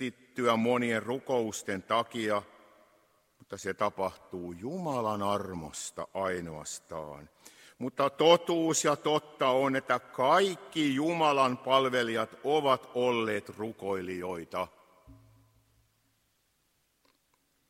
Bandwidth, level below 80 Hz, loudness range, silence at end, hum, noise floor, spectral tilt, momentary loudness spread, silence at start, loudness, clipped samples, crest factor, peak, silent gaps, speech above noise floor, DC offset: 16 kHz; -70 dBFS; 10 LU; 2.55 s; none; -74 dBFS; -4 dB/octave; 14 LU; 0 s; -30 LUFS; under 0.1%; 24 dB; -8 dBFS; none; 44 dB; under 0.1%